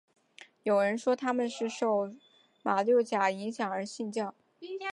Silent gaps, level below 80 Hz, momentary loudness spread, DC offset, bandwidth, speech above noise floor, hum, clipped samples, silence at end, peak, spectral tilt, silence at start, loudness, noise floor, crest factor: none; -84 dBFS; 12 LU; under 0.1%; 11.5 kHz; 27 dB; none; under 0.1%; 0 s; -14 dBFS; -5 dB/octave; 0.4 s; -31 LUFS; -57 dBFS; 18 dB